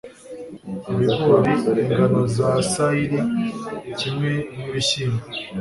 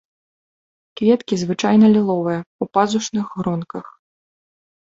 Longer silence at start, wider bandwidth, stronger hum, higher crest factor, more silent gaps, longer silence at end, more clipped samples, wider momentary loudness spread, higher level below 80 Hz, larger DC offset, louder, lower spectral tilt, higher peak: second, 0.05 s vs 0.95 s; first, 11.5 kHz vs 7.8 kHz; neither; about the same, 18 dB vs 18 dB; second, none vs 2.46-2.59 s; second, 0 s vs 0.95 s; neither; first, 16 LU vs 12 LU; first, -50 dBFS vs -60 dBFS; neither; second, -21 LUFS vs -18 LUFS; about the same, -5.5 dB/octave vs -6 dB/octave; about the same, -2 dBFS vs -2 dBFS